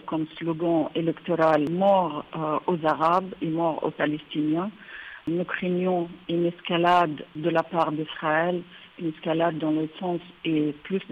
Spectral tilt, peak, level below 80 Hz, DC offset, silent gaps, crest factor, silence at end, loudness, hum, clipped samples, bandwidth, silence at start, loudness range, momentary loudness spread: -8 dB/octave; -10 dBFS; -66 dBFS; under 0.1%; none; 16 dB; 0 s; -26 LUFS; none; under 0.1%; 7.6 kHz; 0.05 s; 3 LU; 10 LU